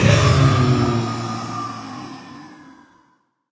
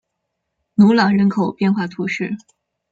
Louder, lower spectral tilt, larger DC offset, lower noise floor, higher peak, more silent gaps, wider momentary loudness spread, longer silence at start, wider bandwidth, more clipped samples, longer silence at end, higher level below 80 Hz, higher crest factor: about the same, -18 LUFS vs -17 LUFS; second, -6 dB/octave vs -7.5 dB/octave; neither; second, -62 dBFS vs -76 dBFS; about the same, 0 dBFS vs -2 dBFS; neither; first, 23 LU vs 12 LU; second, 0 s vs 0.8 s; about the same, 8 kHz vs 7.4 kHz; neither; first, 1 s vs 0.55 s; first, -34 dBFS vs -60 dBFS; about the same, 20 dB vs 16 dB